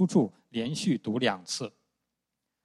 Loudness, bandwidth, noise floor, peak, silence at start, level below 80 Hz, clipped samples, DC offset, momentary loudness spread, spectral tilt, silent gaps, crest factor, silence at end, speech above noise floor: -30 LUFS; 12.5 kHz; -85 dBFS; -10 dBFS; 0 s; -72 dBFS; under 0.1%; under 0.1%; 8 LU; -5 dB/octave; none; 20 dB; 0.95 s; 56 dB